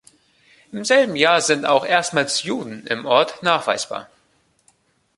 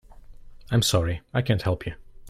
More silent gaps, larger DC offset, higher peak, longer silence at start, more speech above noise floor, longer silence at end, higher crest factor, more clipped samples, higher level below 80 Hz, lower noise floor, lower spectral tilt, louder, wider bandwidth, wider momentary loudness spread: neither; neither; first, 0 dBFS vs -8 dBFS; first, 0.75 s vs 0.15 s; first, 43 dB vs 20 dB; first, 1.15 s vs 0 s; about the same, 20 dB vs 18 dB; neither; second, -66 dBFS vs -44 dBFS; first, -62 dBFS vs -44 dBFS; second, -2.5 dB/octave vs -5 dB/octave; first, -19 LUFS vs -25 LUFS; second, 11.5 kHz vs 15.5 kHz; first, 12 LU vs 9 LU